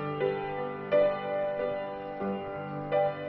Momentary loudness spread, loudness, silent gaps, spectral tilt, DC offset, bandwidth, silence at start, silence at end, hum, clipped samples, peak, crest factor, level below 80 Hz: 10 LU; -31 LUFS; none; -9.5 dB/octave; under 0.1%; 5.2 kHz; 0 s; 0 s; none; under 0.1%; -14 dBFS; 16 dB; -62 dBFS